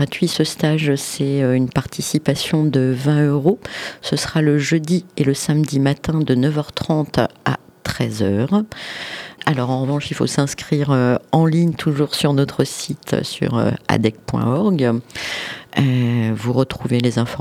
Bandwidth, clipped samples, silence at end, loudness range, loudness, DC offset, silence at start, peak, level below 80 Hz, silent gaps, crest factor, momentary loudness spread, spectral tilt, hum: 15 kHz; under 0.1%; 0 s; 3 LU; -19 LUFS; under 0.1%; 0 s; 0 dBFS; -48 dBFS; none; 18 dB; 7 LU; -6 dB/octave; none